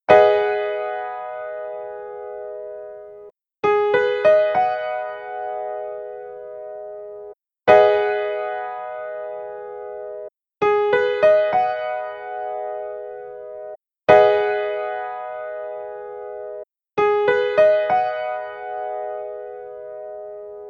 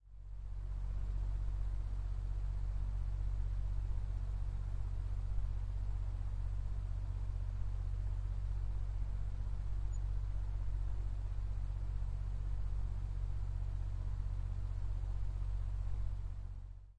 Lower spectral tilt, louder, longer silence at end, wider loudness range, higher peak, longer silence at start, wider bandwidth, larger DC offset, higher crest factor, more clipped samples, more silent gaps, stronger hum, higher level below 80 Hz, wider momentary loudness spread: second, -5.5 dB/octave vs -7.5 dB/octave; first, -20 LUFS vs -43 LUFS; about the same, 0 s vs 0.05 s; about the same, 3 LU vs 1 LU; first, 0 dBFS vs -24 dBFS; about the same, 0.1 s vs 0.05 s; first, 6.6 kHz vs 4.6 kHz; neither; first, 22 dB vs 12 dB; neither; neither; neither; second, -60 dBFS vs -40 dBFS; first, 19 LU vs 2 LU